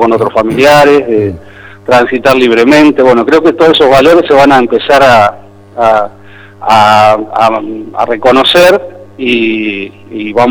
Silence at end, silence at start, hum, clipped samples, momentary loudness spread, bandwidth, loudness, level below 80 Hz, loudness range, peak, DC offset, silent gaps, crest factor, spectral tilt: 0 s; 0 s; none; 2%; 13 LU; over 20 kHz; -7 LUFS; -38 dBFS; 4 LU; 0 dBFS; under 0.1%; none; 6 dB; -5 dB/octave